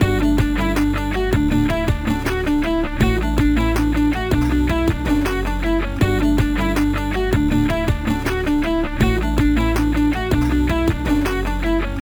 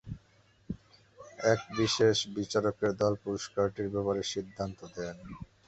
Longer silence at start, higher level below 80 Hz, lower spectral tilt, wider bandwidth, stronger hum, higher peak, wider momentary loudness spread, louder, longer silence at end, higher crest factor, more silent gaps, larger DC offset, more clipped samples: about the same, 0 s vs 0.05 s; first, -24 dBFS vs -58 dBFS; first, -6.5 dB/octave vs -4.5 dB/octave; first, over 20 kHz vs 8.2 kHz; neither; first, -2 dBFS vs -12 dBFS; second, 3 LU vs 18 LU; first, -19 LUFS vs -31 LUFS; second, 0.05 s vs 0.2 s; second, 14 dB vs 20 dB; neither; neither; neither